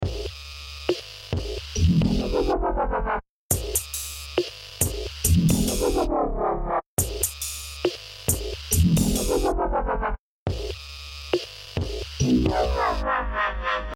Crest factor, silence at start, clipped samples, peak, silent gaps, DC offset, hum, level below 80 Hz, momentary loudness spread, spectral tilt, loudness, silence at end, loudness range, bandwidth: 20 dB; 0 s; under 0.1%; -4 dBFS; 3.29-3.49 s, 6.86-6.97 s, 10.19-10.46 s; under 0.1%; none; -32 dBFS; 11 LU; -4.5 dB/octave; -25 LUFS; 0 s; 2 LU; over 20 kHz